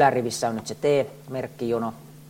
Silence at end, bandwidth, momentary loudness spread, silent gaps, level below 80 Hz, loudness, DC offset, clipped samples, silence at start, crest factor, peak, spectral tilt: 0 s; 16.5 kHz; 10 LU; none; -64 dBFS; -26 LUFS; under 0.1%; under 0.1%; 0 s; 18 dB; -6 dBFS; -5 dB/octave